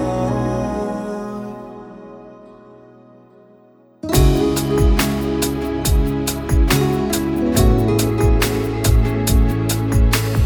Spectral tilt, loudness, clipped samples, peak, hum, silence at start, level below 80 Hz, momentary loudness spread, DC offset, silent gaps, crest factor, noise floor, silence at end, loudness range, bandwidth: -5.5 dB/octave; -18 LUFS; under 0.1%; -2 dBFS; none; 0 s; -22 dBFS; 15 LU; under 0.1%; none; 16 dB; -49 dBFS; 0 s; 11 LU; over 20 kHz